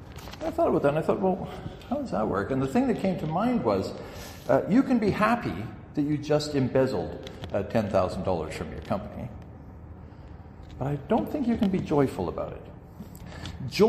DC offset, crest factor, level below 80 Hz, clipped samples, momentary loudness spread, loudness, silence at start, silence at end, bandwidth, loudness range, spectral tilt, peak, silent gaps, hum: under 0.1%; 20 dB; -48 dBFS; under 0.1%; 21 LU; -27 LUFS; 0 s; 0 s; 15 kHz; 5 LU; -7 dB/octave; -8 dBFS; none; none